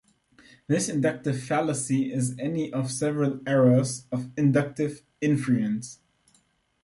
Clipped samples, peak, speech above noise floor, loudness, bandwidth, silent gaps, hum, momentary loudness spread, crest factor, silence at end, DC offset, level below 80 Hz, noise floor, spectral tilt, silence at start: under 0.1%; -8 dBFS; 41 dB; -26 LUFS; 11.5 kHz; none; none; 9 LU; 18 dB; 0.9 s; under 0.1%; -66 dBFS; -67 dBFS; -6 dB/octave; 0.7 s